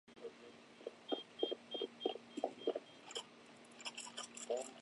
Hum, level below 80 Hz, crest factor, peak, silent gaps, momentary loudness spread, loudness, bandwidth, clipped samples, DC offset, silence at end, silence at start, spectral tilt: none; under -90 dBFS; 24 dB; -22 dBFS; none; 15 LU; -46 LUFS; 11.5 kHz; under 0.1%; under 0.1%; 0 s; 0.05 s; -2 dB/octave